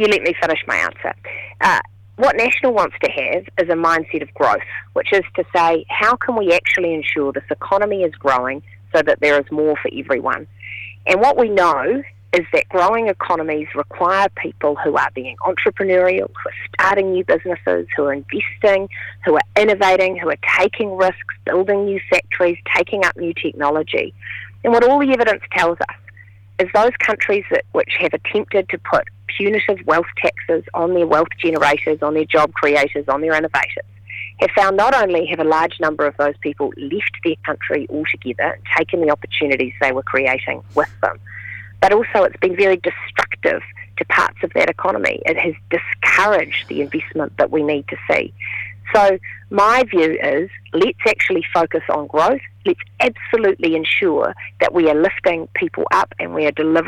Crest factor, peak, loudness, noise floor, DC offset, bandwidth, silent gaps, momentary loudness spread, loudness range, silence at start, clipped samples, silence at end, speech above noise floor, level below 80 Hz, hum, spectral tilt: 16 dB; 0 dBFS; -17 LUFS; -43 dBFS; under 0.1%; 13.5 kHz; none; 8 LU; 2 LU; 0 s; under 0.1%; 0 s; 26 dB; -54 dBFS; none; -5 dB/octave